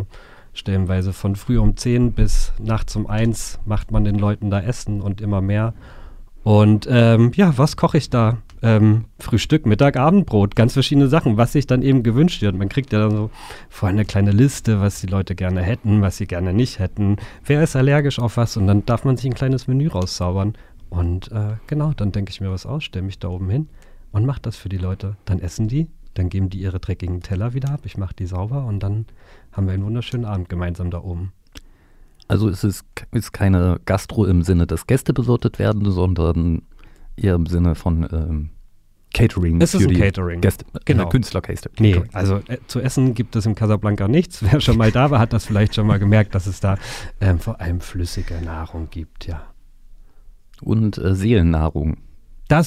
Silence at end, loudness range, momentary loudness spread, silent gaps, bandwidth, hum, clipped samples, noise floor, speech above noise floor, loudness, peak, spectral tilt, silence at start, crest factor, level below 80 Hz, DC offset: 0 s; 9 LU; 12 LU; none; 14 kHz; none; under 0.1%; -48 dBFS; 30 dB; -19 LUFS; -2 dBFS; -7 dB/octave; 0 s; 16 dB; -30 dBFS; under 0.1%